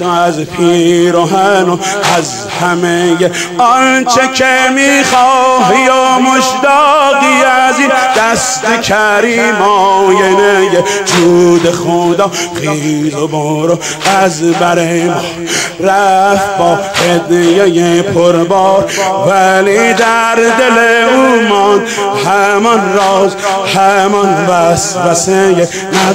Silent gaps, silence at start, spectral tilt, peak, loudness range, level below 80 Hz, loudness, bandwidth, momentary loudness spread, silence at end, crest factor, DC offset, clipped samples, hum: none; 0 s; -4 dB/octave; 0 dBFS; 3 LU; -46 dBFS; -9 LUFS; 16.5 kHz; 5 LU; 0 s; 8 dB; 0.2%; under 0.1%; none